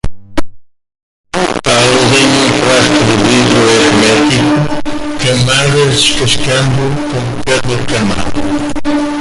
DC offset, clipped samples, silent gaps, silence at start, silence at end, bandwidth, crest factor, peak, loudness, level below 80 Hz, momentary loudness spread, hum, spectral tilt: under 0.1%; under 0.1%; 1.03-1.24 s; 0.05 s; 0 s; 11.5 kHz; 10 dB; 0 dBFS; -10 LUFS; -30 dBFS; 9 LU; none; -4 dB/octave